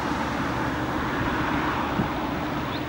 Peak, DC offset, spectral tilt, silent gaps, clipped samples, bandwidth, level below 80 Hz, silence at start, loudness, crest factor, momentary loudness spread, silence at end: -12 dBFS; under 0.1%; -6 dB/octave; none; under 0.1%; 16 kHz; -42 dBFS; 0 s; -26 LUFS; 14 dB; 3 LU; 0 s